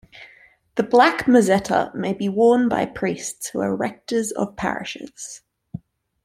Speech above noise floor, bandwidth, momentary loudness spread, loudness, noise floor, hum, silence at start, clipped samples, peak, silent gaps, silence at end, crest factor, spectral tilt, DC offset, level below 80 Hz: 32 dB; 15.5 kHz; 20 LU; -20 LUFS; -52 dBFS; none; 0.15 s; under 0.1%; -2 dBFS; none; 0.45 s; 20 dB; -5 dB/octave; under 0.1%; -56 dBFS